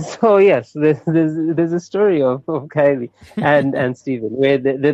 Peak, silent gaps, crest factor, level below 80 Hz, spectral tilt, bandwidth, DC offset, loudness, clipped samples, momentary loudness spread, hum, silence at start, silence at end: -4 dBFS; none; 12 dB; -58 dBFS; -7.5 dB/octave; 8 kHz; under 0.1%; -16 LUFS; under 0.1%; 10 LU; none; 0 s; 0 s